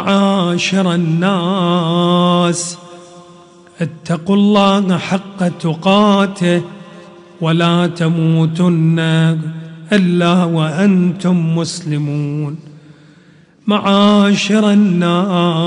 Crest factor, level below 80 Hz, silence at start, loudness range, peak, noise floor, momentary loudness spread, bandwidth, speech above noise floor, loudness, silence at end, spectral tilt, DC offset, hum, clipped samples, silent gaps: 14 dB; -58 dBFS; 0 s; 3 LU; 0 dBFS; -46 dBFS; 10 LU; 10.5 kHz; 33 dB; -14 LUFS; 0 s; -6 dB/octave; under 0.1%; none; under 0.1%; none